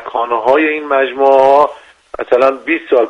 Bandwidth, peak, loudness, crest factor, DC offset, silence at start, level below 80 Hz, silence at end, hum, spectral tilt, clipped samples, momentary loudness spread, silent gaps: 7.6 kHz; 0 dBFS; -12 LUFS; 12 dB; under 0.1%; 0 s; -54 dBFS; 0 s; none; -5 dB/octave; under 0.1%; 9 LU; none